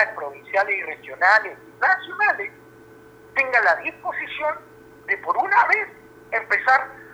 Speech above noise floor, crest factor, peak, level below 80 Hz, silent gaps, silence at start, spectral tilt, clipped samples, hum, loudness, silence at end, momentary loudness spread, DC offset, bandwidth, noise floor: 25 dB; 20 dB; -4 dBFS; -66 dBFS; none; 0 s; -3 dB/octave; under 0.1%; none; -21 LUFS; 0 s; 15 LU; under 0.1%; over 20 kHz; -47 dBFS